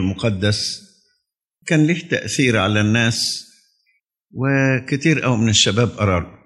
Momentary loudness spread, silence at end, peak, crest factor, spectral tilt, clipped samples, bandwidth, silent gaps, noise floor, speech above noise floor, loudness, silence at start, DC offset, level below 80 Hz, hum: 9 LU; 0.15 s; -2 dBFS; 16 dB; -4.5 dB/octave; under 0.1%; 12.5 kHz; none; -73 dBFS; 56 dB; -18 LUFS; 0 s; under 0.1%; -48 dBFS; none